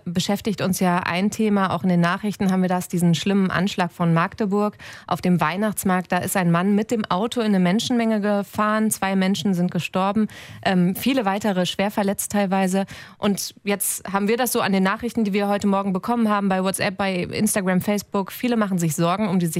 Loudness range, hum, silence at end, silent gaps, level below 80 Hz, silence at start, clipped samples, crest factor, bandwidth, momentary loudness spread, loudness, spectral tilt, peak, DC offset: 1 LU; none; 0 s; none; -56 dBFS; 0.05 s; under 0.1%; 14 dB; 16 kHz; 4 LU; -21 LUFS; -5 dB/octave; -6 dBFS; under 0.1%